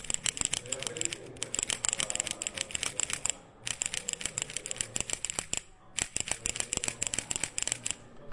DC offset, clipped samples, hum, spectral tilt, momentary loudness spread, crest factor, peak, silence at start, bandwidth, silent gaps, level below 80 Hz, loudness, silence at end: under 0.1%; under 0.1%; none; 0 dB/octave; 6 LU; 28 dB; -8 dBFS; 0 s; 11.5 kHz; none; -56 dBFS; -32 LUFS; 0 s